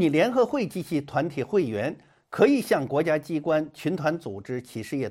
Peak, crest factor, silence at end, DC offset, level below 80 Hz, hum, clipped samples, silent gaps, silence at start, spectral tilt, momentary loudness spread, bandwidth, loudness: -6 dBFS; 18 dB; 0 s; under 0.1%; -64 dBFS; none; under 0.1%; none; 0 s; -6.5 dB/octave; 12 LU; 16 kHz; -26 LUFS